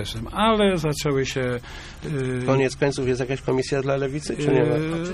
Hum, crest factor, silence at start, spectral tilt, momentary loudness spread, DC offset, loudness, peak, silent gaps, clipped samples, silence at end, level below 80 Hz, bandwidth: none; 16 dB; 0 s; -5.5 dB/octave; 8 LU; under 0.1%; -23 LUFS; -6 dBFS; none; under 0.1%; 0 s; -42 dBFS; 14 kHz